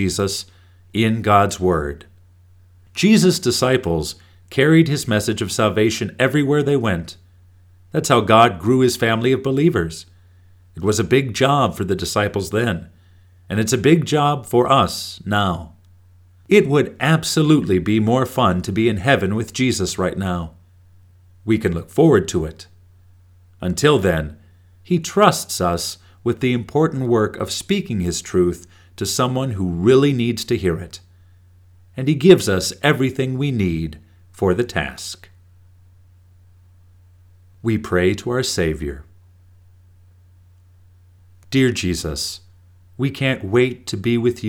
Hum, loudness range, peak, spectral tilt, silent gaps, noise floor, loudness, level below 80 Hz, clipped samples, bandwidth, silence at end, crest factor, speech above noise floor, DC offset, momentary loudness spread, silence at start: none; 7 LU; 0 dBFS; -5.5 dB/octave; none; -49 dBFS; -18 LUFS; -44 dBFS; under 0.1%; 18.5 kHz; 0 s; 20 dB; 32 dB; under 0.1%; 13 LU; 0 s